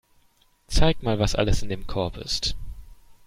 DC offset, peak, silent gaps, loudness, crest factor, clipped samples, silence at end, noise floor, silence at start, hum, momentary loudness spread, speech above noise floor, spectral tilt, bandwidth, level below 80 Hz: under 0.1%; -4 dBFS; none; -26 LUFS; 20 dB; under 0.1%; 0.35 s; -61 dBFS; 0.7 s; none; 8 LU; 39 dB; -5 dB/octave; 14.5 kHz; -30 dBFS